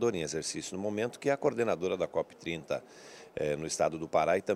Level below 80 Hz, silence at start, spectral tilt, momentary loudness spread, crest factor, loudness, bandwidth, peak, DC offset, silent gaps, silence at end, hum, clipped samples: -64 dBFS; 0 s; -4.5 dB/octave; 8 LU; 18 dB; -33 LUFS; 14 kHz; -14 dBFS; under 0.1%; none; 0 s; none; under 0.1%